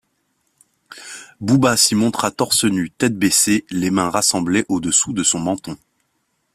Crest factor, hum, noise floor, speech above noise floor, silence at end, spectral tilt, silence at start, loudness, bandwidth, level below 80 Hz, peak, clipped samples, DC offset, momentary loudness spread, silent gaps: 18 dB; none; -69 dBFS; 51 dB; 0.8 s; -3 dB/octave; 0.9 s; -17 LUFS; 16 kHz; -54 dBFS; 0 dBFS; under 0.1%; under 0.1%; 20 LU; none